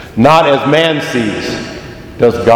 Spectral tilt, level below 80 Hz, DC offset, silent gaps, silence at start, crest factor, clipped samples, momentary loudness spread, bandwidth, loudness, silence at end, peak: -5.5 dB/octave; -40 dBFS; under 0.1%; none; 0 s; 12 dB; 0.7%; 17 LU; 17.5 kHz; -11 LUFS; 0 s; 0 dBFS